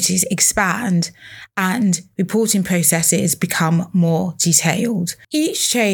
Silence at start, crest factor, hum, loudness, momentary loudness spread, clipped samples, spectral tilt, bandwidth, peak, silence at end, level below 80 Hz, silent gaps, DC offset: 0 s; 18 dB; none; -17 LUFS; 7 LU; under 0.1%; -3.5 dB/octave; 20 kHz; 0 dBFS; 0 s; -52 dBFS; none; under 0.1%